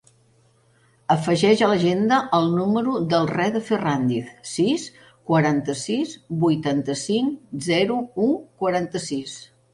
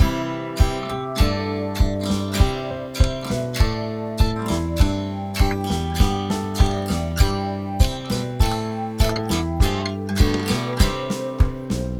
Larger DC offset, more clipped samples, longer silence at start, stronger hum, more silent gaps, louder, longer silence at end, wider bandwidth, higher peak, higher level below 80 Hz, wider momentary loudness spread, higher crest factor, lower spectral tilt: neither; neither; first, 1.1 s vs 0 s; neither; neither; about the same, -22 LUFS vs -22 LUFS; first, 0.3 s vs 0 s; second, 11.5 kHz vs 18 kHz; about the same, -4 dBFS vs -2 dBFS; second, -60 dBFS vs -24 dBFS; first, 10 LU vs 6 LU; about the same, 18 dB vs 18 dB; about the same, -5.5 dB/octave vs -5.5 dB/octave